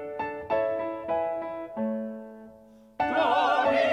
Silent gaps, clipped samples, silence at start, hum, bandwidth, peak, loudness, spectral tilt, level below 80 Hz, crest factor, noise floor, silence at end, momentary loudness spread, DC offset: none; under 0.1%; 0 s; none; 9.8 kHz; -12 dBFS; -28 LUFS; -5.5 dB/octave; -62 dBFS; 16 dB; -53 dBFS; 0 s; 15 LU; under 0.1%